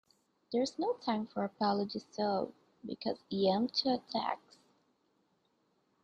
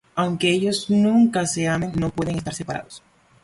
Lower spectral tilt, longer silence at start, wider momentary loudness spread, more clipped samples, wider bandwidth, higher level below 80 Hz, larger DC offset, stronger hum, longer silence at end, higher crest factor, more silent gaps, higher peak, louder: about the same, -5.5 dB/octave vs -5 dB/octave; first, 0.5 s vs 0.15 s; second, 9 LU vs 12 LU; neither; second, 9 kHz vs 11.5 kHz; second, -78 dBFS vs -50 dBFS; neither; neither; first, 1.65 s vs 0.45 s; about the same, 18 dB vs 14 dB; neither; second, -18 dBFS vs -6 dBFS; second, -35 LUFS vs -21 LUFS